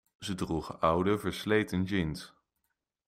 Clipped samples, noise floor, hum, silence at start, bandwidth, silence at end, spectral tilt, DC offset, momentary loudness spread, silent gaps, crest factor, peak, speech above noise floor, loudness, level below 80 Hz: under 0.1%; -83 dBFS; none; 0.2 s; 16 kHz; 0.8 s; -6 dB/octave; under 0.1%; 10 LU; none; 20 dB; -12 dBFS; 52 dB; -31 LUFS; -56 dBFS